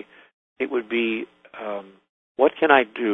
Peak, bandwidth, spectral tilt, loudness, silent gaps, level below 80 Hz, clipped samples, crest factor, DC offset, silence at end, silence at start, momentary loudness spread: 0 dBFS; 4 kHz; -6.5 dB/octave; -22 LUFS; 2.09-2.35 s; -66 dBFS; under 0.1%; 24 dB; under 0.1%; 0 s; 0.6 s; 18 LU